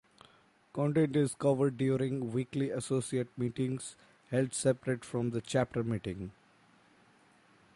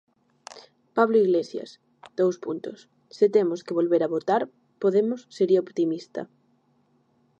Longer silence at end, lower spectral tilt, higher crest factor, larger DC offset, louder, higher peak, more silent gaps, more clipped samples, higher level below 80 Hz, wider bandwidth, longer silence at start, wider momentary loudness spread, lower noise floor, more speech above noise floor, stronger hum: first, 1.45 s vs 1.15 s; about the same, -6.5 dB/octave vs -7 dB/octave; about the same, 18 dB vs 20 dB; neither; second, -33 LUFS vs -24 LUFS; second, -16 dBFS vs -6 dBFS; neither; neither; first, -64 dBFS vs -82 dBFS; first, 11.5 kHz vs 8.4 kHz; first, 0.75 s vs 0.5 s; second, 9 LU vs 18 LU; about the same, -64 dBFS vs -66 dBFS; second, 32 dB vs 42 dB; neither